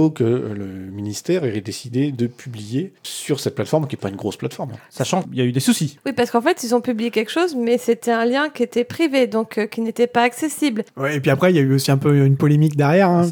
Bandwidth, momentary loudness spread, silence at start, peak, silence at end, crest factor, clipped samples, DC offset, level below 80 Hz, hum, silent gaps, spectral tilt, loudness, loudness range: 19 kHz; 12 LU; 0 s; -4 dBFS; 0 s; 16 dB; under 0.1%; under 0.1%; -64 dBFS; none; none; -6 dB/octave; -19 LUFS; 7 LU